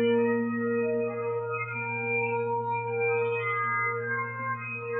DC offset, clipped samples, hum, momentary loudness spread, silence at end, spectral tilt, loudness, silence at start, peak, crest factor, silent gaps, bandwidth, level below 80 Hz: under 0.1%; under 0.1%; none; 5 LU; 0 s; -10 dB/octave; -29 LUFS; 0 s; -14 dBFS; 14 dB; none; 3.9 kHz; -78 dBFS